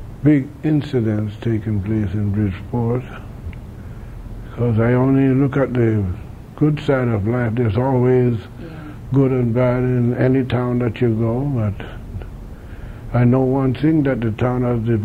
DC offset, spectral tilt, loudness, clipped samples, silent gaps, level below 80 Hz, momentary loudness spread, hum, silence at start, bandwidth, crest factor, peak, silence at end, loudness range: under 0.1%; -10 dB/octave; -18 LUFS; under 0.1%; none; -38 dBFS; 18 LU; none; 0 s; 4.9 kHz; 14 dB; -4 dBFS; 0 s; 4 LU